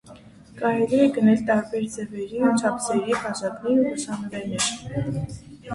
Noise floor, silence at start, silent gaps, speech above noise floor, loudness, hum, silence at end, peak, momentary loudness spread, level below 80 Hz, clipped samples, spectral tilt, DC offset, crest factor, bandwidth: -47 dBFS; 0.05 s; none; 24 dB; -23 LUFS; none; 0 s; -6 dBFS; 11 LU; -54 dBFS; under 0.1%; -5 dB/octave; under 0.1%; 18 dB; 11.5 kHz